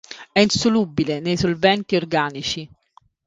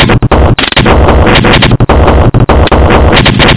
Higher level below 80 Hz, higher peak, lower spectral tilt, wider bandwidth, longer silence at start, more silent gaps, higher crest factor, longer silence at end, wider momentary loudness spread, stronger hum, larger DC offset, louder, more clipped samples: second, -48 dBFS vs -10 dBFS; about the same, 0 dBFS vs 0 dBFS; second, -4.5 dB/octave vs -10 dB/octave; first, 9.4 kHz vs 4 kHz; about the same, 0.1 s vs 0 s; neither; first, 20 dB vs 4 dB; first, 0.6 s vs 0 s; first, 8 LU vs 2 LU; neither; neither; second, -20 LUFS vs -5 LUFS; second, under 0.1% vs 2%